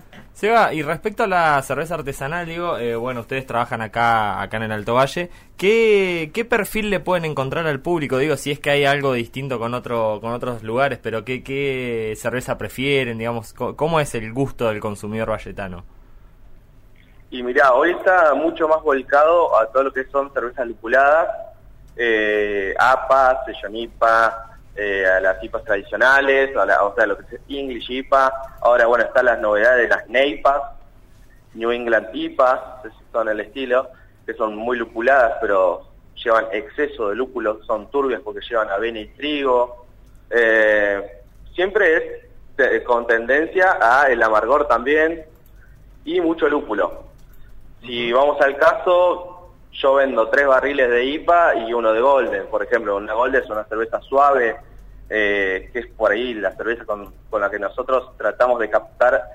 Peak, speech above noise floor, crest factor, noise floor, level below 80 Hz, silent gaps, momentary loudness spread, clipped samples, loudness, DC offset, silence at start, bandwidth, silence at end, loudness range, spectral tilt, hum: -4 dBFS; 28 dB; 16 dB; -47 dBFS; -44 dBFS; none; 12 LU; under 0.1%; -19 LUFS; under 0.1%; 0.1 s; 16 kHz; 0 s; 6 LU; -5 dB/octave; none